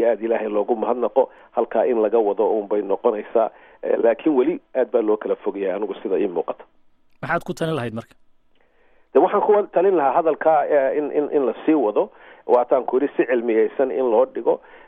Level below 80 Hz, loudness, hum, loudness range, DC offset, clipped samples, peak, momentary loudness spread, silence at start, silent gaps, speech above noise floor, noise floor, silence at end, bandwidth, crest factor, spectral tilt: -62 dBFS; -20 LUFS; none; 6 LU; under 0.1%; under 0.1%; -4 dBFS; 8 LU; 0 s; none; 36 dB; -56 dBFS; 0.1 s; 10 kHz; 16 dB; -7.5 dB/octave